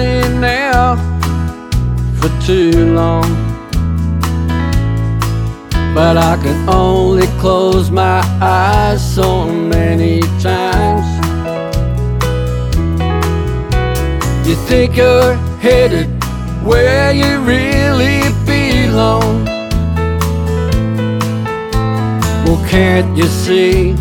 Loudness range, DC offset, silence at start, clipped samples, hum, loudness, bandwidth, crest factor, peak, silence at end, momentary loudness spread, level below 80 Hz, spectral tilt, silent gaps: 4 LU; under 0.1%; 0 s; under 0.1%; none; -13 LUFS; 19 kHz; 12 dB; 0 dBFS; 0 s; 7 LU; -20 dBFS; -6.5 dB/octave; none